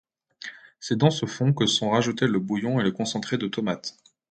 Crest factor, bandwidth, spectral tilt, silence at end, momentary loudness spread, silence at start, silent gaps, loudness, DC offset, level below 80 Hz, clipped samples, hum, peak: 22 dB; 9.2 kHz; -5 dB/octave; 0.4 s; 17 LU; 0.4 s; none; -24 LUFS; under 0.1%; -64 dBFS; under 0.1%; none; -4 dBFS